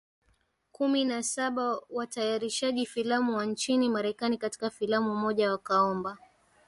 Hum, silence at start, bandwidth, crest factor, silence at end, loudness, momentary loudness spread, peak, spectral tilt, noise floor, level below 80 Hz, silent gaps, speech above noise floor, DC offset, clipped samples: none; 0.8 s; 11.5 kHz; 16 dB; 0.5 s; -29 LUFS; 6 LU; -14 dBFS; -3.5 dB/octave; -71 dBFS; -72 dBFS; none; 42 dB; under 0.1%; under 0.1%